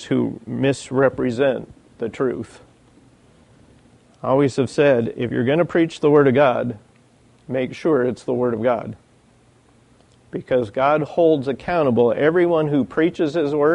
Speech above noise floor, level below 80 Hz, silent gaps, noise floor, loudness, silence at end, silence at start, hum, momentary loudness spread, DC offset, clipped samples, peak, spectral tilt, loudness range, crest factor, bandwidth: 36 dB; -56 dBFS; none; -54 dBFS; -19 LUFS; 0 s; 0 s; none; 12 LU; under 0.1%; under 0.1%; -4 dBFS; -7 dB/octave; 6 LU; 16 dB; 10.5 kHz